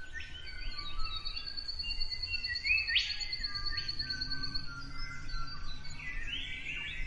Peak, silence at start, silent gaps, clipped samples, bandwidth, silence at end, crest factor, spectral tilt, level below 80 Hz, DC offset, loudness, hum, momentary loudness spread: -16 dBFS; 0 s; none; under 0.1%; 8.4 kHz; 0 s; 18 dB; -2 dB/octave; -42 dBFS; under 0.1%; -36 LUFS; none; 14 LU